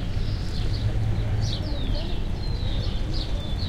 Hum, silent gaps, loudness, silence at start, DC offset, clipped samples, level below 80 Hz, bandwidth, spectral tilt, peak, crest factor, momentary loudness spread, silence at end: none; none; -28 LUFS; 0 s; under 0.1%; under 0.1%; -28 dBFS; 10.5 kHz; -6.5 dB/octave; -12 dBFS; 12 dB; 4 LU; 0 s